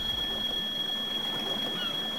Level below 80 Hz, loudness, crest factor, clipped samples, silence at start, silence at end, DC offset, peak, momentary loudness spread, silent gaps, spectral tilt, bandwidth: -52 dBFS; -29 LUFS; 12 dB; under 0.1%; 0 s; 0 s; 0.3%; -20 dBFS; 1 LU; none; -2.5 dB/octave; 16.5 kHz